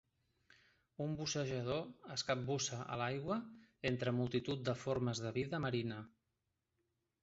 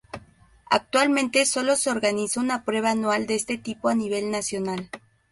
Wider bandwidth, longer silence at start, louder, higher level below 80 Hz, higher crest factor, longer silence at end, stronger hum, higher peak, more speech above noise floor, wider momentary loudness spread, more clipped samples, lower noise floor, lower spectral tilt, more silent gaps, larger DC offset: second, 8 kHz vs 11.5 kHz; first, 1 s vs 0.15 s; second, -40 LUFS vs -24 LUFS; second, -68 dBFS vs -62 dBFS; about the same, 20 dB vs 18 dB; first, 1.15 s vs 0.35 s; neither; second, -22 dBFS vs -6 dBFS; first, 47 dB vs 29 dB; second, 7 LU vs 11 LU; neither; first, -87 dBFS vs -53 dBFS; first, -5 dB/octave vs -3 dB/octave; neither; neither